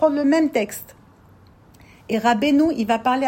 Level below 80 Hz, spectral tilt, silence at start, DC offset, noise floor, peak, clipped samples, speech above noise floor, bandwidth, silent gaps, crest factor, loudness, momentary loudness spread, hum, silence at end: -56 dBFS; -5 dB/octave; 0 s; under 0.1%; -50 dBFS; -4 dBFS; under 0.1%; 31 dB; 16.5 kHz; none; 16 dB; -20 LUFS; 10 LU; none; 0 s